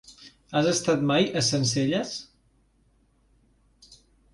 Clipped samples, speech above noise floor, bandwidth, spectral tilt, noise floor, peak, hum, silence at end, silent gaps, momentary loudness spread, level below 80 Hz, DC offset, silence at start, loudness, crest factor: under 0.1%; 40 dB; 11.5 kHz; -4 dB/octave; -64 dBFS; -10 dBFS; none; 2.1 s; none; 8 LU; -60 dBFS; under 0.1%; 0.1 s; -24 LUFS; 18 dB